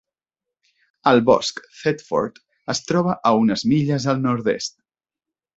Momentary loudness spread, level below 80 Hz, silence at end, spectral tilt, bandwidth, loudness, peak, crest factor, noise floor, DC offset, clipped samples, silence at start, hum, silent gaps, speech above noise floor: 10 LU; -58 dBFS; 0.9 s; -5.5 dB/octave; 8 kHz; -20 LUFS; -2 dBFS; 20 dB; -88 dBFS; under 0.1%; under 0.1%; 1.05 s; none; none; 69 dB